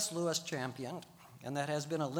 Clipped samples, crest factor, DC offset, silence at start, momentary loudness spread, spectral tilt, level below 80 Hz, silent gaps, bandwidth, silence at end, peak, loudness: under 0.1%; 18 dB; under 0.1%; 0 s; 13 LU; -4 dB/octave; -80 dBFS; none; over 20 kHz; 0 s; -20 dBFS; -38 LUFS